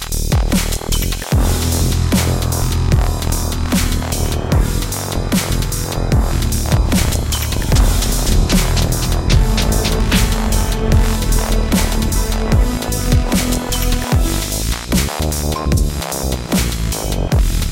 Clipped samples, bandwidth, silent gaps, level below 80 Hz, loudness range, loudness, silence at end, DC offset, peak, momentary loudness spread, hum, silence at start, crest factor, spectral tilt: under 0.1%; 17 kHz; none; -18 dBFS; 2 LU; -17 LUFS; 0 s; under 0.1%; 0 dBFS; 4 LU; none; 0 s; 14 dB; -4.5 dB/octave